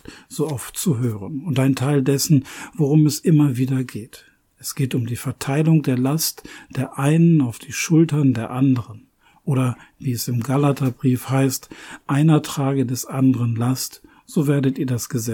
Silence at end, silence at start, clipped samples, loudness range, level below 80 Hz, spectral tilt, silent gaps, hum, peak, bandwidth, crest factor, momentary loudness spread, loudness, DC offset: 0 s; 0.1 s; under 0.1%; 3 LU; -58 dBFS; -6 dB/octave; none; none; -4 dBFS; 18.5 kHz; 14 dB; 12 LU; -20 LUFS; under 0.1%